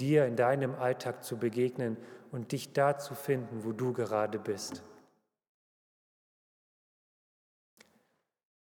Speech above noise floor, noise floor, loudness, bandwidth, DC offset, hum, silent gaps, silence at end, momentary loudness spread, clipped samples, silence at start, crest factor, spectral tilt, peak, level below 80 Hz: 45 dB; -76 dBFS; -33 LUFS; over 20 kHz; under 0.1%; none; none; 3.65 s; 11 LU; under 0.1%; 0 s; 20 dB; -6 dB/octave; -14 dBFS; -84 dBFS